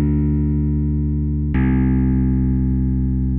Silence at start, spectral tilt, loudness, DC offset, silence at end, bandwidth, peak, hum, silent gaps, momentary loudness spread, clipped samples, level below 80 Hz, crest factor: 0 s; -14 dB/octave; -19 LUFS; under 0.1%; 0 s; 3 kHz; -6 dBFS; none; none; 3 LU; under 0.1%; -22 dBFS; 10 dB